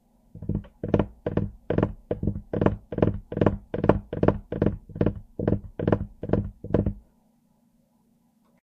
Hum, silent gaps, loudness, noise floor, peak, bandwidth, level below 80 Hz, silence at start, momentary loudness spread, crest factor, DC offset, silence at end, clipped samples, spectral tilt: none; none; -27 LUFS; -65 dBFS; 0 dBFS; 5.4 kHz; -40 dBFS; 0.35 s; 6 LU; 28 dB; under 0.1%; 1.6 s; under 0.1%; -10.5 dB/octave